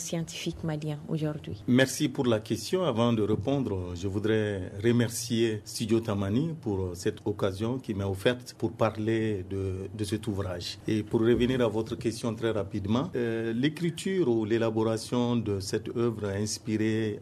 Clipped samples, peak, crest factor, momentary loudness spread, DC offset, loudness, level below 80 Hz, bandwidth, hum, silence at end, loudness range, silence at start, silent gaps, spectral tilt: under 0.1%; -10 dBFS; 18 dB; 7 LU; under 0.1%; -29 LUFS; -50 dBFS; 14 kHz; none; 0 s; 2 LU; 0 s; none; -6 dB/octave